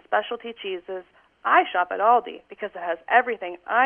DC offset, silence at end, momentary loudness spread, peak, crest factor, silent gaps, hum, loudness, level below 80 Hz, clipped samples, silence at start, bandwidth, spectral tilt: under 0.1%; 0 s; 15 LU; -4 dBFS; 20 dB; none; none; -23 LUFS; -72 dBFS; under 0.1%; 0.1 s; 3.6 kHz; -6 dB/octave